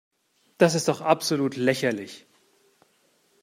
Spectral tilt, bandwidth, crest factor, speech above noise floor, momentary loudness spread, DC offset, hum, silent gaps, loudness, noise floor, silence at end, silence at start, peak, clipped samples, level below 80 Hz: -4.5 dB/octave; 16 kHz; 22 dB; 42 dB; 15 LU; under 0.1%; none; none; -24 LUFS; -65 dBFS; 1.25 s; 0.6 s; -4 dBFS; under 0.1%; -72 dBFS